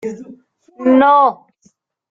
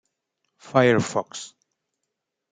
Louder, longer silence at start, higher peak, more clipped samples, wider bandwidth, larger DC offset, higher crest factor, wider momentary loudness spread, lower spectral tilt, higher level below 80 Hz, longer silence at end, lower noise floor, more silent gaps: first, -12 LUFS vs -21 LUFS; second, 0.05 s vs 0.65 s; about the same, -2 dBFS vs -4 dBFS; neither; second, 7.2 kHz vs 9.6 kHz; neither; second, 14 dB vs 22 dB; about the same, 19 LU vs 19 LU; about the same, -6.5 dB/octave vs -5.5 dB/octave; about the same, -62 dBFS vs -66 dBFS; second, 0.75 s vs 1.05 s; second, -57 dBFS vs -81 dBFS; neither